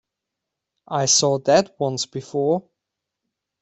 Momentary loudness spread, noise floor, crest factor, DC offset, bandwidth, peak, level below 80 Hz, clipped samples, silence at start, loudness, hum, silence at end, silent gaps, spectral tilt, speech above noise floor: 10 LU; -83 dBFS; 20 dB; under 0.1%; 8.4 kHz; -4 dBFS; -64 dBFS; under 0.1%; 0.9 s; -20 LUFS; none; 1 s; none; -3 dB/octave; 63 dB